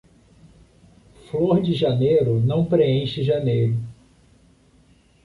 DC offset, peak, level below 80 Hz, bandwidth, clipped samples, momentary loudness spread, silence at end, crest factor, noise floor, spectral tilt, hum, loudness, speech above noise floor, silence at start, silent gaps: under 0.1%; -6 dBFS; -52 dBFS; 10.5 kHz; under 0.1%; 7 LU; 1.3 s; 16 dB; -56 dBFS; -9 dB/octave; none; -20 LUFS; 36 dB; 1.35 s; none